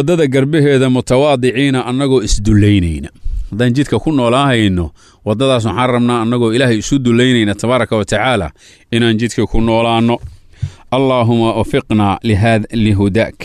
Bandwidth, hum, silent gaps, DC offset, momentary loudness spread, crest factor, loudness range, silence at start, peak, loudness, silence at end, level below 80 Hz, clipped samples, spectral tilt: 12.5 kHz; none; none; under 0.1%; 9 LU; 10 dB; 2 LU; 0 s; -2 dBFS; -13 LUFS; 0 s; -28 dBFS; under 0.1%; -6 dB/octave